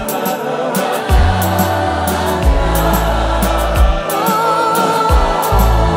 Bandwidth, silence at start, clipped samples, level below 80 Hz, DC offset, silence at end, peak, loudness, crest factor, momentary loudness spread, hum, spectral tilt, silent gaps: 16.5 kHz; 0 s; under 0.1%; -18 dBFS; under 0.1%; 0 s; 0 dBFS; -14 LUFS; 12 dB; 4 LU; none; -5 dB/octave; none